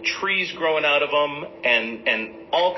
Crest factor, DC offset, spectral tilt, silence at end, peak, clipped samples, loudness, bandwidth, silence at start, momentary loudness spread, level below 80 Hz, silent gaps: 18 dB; under 0.1%; -3 dB/octave; 0 s; -4 dBFS; under 0.1%; -21 LUFS; 6.2 kHz; 0 s; 6 LU; -64 dBFS; none